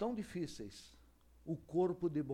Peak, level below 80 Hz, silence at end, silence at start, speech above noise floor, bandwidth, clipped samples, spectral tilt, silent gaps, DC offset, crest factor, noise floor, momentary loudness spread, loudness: -24 dBFS; -66 dBFS; 0 s; 0 s; 26 dB; 13.5 kHz; under 0.1%; -7 dB/octave; none; under 0.1%; 16 dB; -65 dBFS; 19 LU; -40 LUFS